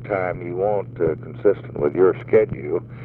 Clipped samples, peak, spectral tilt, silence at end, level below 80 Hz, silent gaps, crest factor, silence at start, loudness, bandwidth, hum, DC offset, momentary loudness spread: under 0.1%; -4 dBFS; -11 dB/octave; 0 s; -50 dBFS; none; 16 dB; 0 s; -21 LUFS; 4.1 kHz; none; under 0.1%; 7 LU